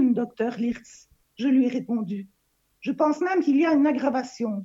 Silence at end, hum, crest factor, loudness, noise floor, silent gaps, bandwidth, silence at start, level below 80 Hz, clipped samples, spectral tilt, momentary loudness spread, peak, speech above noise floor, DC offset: 0 s; none; 16 dB; -24 LUFS; -59 dBFS; none; 7.8 kHz; 0 s; -68 dBFS; under 0.1%; -6.5 dB/octave; 12 LU; -10 dBFS; 35 dB; under 0.1%